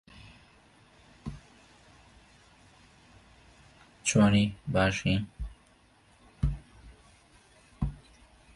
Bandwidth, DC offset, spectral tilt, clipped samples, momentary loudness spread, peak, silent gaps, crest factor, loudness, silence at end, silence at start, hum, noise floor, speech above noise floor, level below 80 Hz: 11.5 kHz; under 0.1%; -5 dB/octave; under 0.1%; 25 LU; -12 dBFS; none; 20 dB; -28 LUFS; 0.6 s; 0.25 s; none; -62 dBFS; 36 dB; -46 dBFS